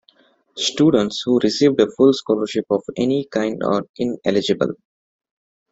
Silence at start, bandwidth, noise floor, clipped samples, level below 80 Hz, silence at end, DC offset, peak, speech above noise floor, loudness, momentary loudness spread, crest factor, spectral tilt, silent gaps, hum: 0.55 s; 8 kHz; -57 dBFS; under 0.1%; -58 dBFS; 0.95 s; under 0.1%; -2 dBFS; 39 dB; -19 LUFS; 7 LU; 18 dB; -5 dB/octave; 3.89-3.94 s; none